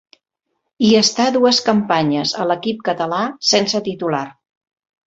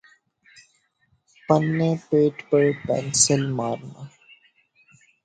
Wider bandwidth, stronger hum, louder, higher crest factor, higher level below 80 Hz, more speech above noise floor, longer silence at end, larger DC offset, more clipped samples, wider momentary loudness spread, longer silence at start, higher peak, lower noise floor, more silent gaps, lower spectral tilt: second, 8 kHz vs 9.4 kHz; neither; first, -16 LUFS vs -21 LUFS; about the same, 16 dB vs 20 dB; about the same, -60 dBFS vs -60 dBFS; first, 58 dB vs 46 dB; second, 0.75 s vs 1.15 s; neither; neither; second, 8 LU vs 23 LU; second, 0.8 s vs 1.5 s; about the same, -2 dBFS vs -4 dBFS; first, -74 dBFS vs -67 dBFS; neither; about the same, -3.5 dB/octave vs -4.5 dB/octave